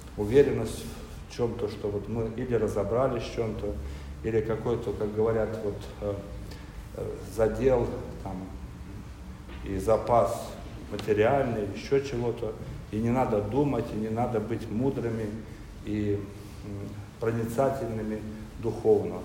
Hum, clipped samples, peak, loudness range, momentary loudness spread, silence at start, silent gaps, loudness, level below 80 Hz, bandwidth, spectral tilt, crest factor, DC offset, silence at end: none; under 0.1%; -8 dBFS; 4 LU; 16 LU; 0 s; none; -29 LUFS; -44 dBFS; 16 kHz; -7 dB/octave; 22 dB; under 0.1%; 0 s